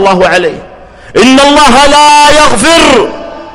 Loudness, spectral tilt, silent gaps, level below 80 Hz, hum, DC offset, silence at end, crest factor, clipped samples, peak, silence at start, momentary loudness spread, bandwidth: -4 LUFS; -2.5 dB/octave; none; -26 dBFS; none; under 0.1%; 0 s; 6 dB; 3%; 0 dBFS; 0 s; 13 LU; over 20 kHz